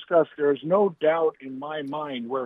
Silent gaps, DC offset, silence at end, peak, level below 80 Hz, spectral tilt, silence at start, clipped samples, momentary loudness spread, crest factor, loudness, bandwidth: none; under 0.1%; 0 s; -8 dBFS; -78 dBFS; -8.5 dB/octave; 0 s; under 0.1%; 11 LU; 16 dB; -25 LUFS; 3.9 kHz